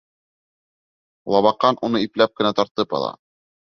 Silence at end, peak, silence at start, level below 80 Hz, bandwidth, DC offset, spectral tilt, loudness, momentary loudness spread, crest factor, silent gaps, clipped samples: 0.5 s; -2 dBFS; 1.25 s; -62 dBFS; 6.6 kHz; under 0.1%; -6 dB/octave; -20 LUFS; 8 LU; 20 dB; 2.71-2.75 s; under 0.1%